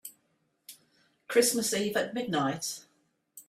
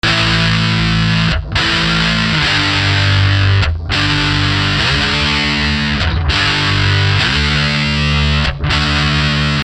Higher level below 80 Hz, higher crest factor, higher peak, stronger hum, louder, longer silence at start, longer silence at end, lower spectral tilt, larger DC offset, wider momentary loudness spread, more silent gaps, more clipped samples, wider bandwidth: second, -74 dBFS vs -24 dBFS; first, 22 dB vs 12 dB; second, -10 dBFS vs 0 dBFS; neither; second, -29 LUFS vs -13 LUFS; about the same, 0.05 s vs 0.05 s; about the same, 0.1 s vs 0 s; second, -3 dB/octave vs -4.5 dB/octave; neither; first, 25 LU vs 3 LU; neither; neither; first, 16 kHz vs 10 kHz